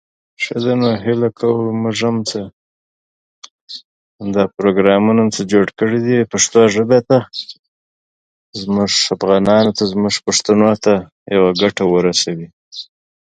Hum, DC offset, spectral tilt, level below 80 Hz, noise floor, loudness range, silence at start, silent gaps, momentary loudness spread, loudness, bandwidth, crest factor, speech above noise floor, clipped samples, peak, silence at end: none; under 0.1%; -4.5 dB/octave; -52 dBFS; under -90 dBFS; 6 LU; 0.4 s; 2.53-3.42 s, 3.51-3.68 s, 3.84-4.19 s, 7.59-8.53 s, 11.12-11.26 s, 12.53-12.71 s; 17 LU; -15 LUFS; 9.6 kHz; 16 dB; over 76 dB; under 0.1%; 0 dBFS; 0.5 s